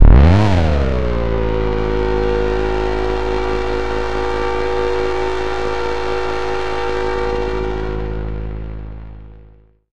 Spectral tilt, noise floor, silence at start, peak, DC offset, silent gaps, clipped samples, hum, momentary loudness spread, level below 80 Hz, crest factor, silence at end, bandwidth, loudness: -7.5 dB/octave; -46 dBFS; 0 s; 0 dBFS; 6%; none; under 0.1%; none; 11 LU; -20 dBFS; 16 dB; 0 s; 8.8 kHz; -19 LUFS